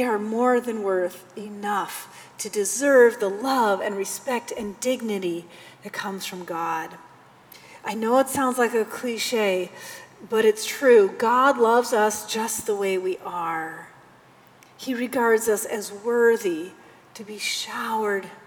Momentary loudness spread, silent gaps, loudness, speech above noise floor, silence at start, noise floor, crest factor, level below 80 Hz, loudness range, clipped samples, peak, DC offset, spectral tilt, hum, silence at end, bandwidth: 17 LU; none; -23 LUFS; 29 dB; 0 s; -52 dBFS; 18 dB; -70 dBFS; 8 LU; under 0.1%; -6 dBFS; under 0.1%; -3 dB/octave; none; 0.1 s; over 20 kHz